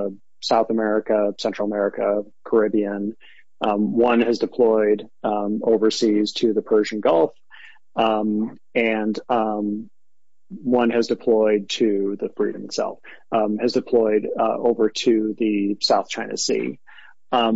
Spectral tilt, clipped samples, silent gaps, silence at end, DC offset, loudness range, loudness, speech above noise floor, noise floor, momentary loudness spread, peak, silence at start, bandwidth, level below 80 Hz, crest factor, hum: -4.5 dB/octave; under 0.1%; none; 0 s; 0.5%; 3 LU; -21 LUFS; 66 dB; -86 dBFS; 8 LU; -6 dBFS; 0 s; 8 kHz; -70 dBFS; 14 dB; none